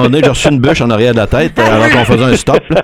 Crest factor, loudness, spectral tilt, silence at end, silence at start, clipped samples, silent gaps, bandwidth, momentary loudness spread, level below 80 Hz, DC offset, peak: 8 dB; -9 LUFS; -5.5 dB/octave; 0 s; 0 s; 0.6%; none; 15.5 kHz; 3 LU; -28 dBFS; 0.3%; 0 dBFS